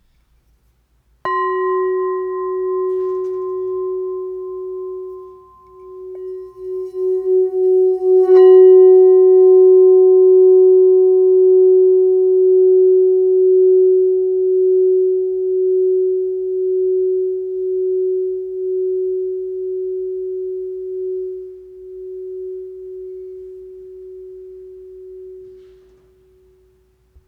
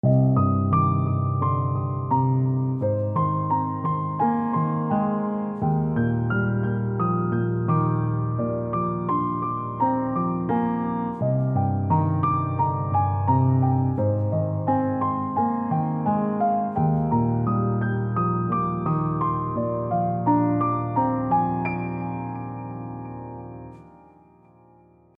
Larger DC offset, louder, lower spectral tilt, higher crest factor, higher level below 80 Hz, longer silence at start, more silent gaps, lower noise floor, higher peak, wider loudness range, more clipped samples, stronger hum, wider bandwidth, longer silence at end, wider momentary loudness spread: neither; first, -14 LUFS vs -24 LUFS; second, -8.5 dB/octave vs -13 dB/octave; about the same, 14 dB vs 14 dB; second, -60 dBFS vs -50 dBFS; first, 1.25 s vs 0.05 s; neither; first, -59 dBFS vs -55 dBFS; first, -2 dBFS vs -8 dBFS; first, 19 LU vs 2 LU; neither; neither; about the same, 3.1 kHz vs 3.4 kHz; first, 1.75 s vs 1.25 s; first, 22 LU vs 6 LU